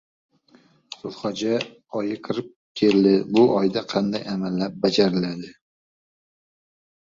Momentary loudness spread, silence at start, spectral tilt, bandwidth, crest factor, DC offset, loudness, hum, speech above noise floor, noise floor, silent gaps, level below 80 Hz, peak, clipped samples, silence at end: 18 LU; 1.05 s; -6.5 dB/octave; 7.6 kHz; 18 dB; under 0.1%; -22 LUFS; none; 35 dB; -57 dBFS; 2.56-2.75 s; -62 dBFS; -6 dBFS; under 0.1%; 1.5 s